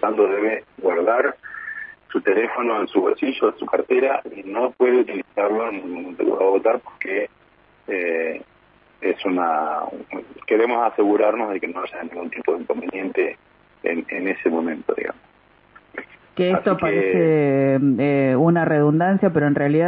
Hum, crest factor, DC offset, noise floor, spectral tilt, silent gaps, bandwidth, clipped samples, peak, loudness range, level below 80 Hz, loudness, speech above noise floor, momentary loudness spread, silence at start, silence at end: none; 18 dB; under 0.1%; -55 dBFS; -11 dB/octave; none; 5 kHz; under 0.1%; -2 dBFS; 7 LU; -64 dBFS; -21 LUFS; 35 dB; 13 LU; 0 s; 0 s